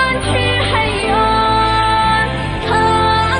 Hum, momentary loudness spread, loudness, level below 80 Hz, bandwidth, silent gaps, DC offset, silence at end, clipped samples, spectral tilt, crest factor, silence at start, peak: none; 3 LU; -14 LUFS; -28 dBFS; 10 kHz; none; under 0.1%; 0 s; under 0.1%; -5 dB/octave; 12 dB; 0 s; -2 dBFS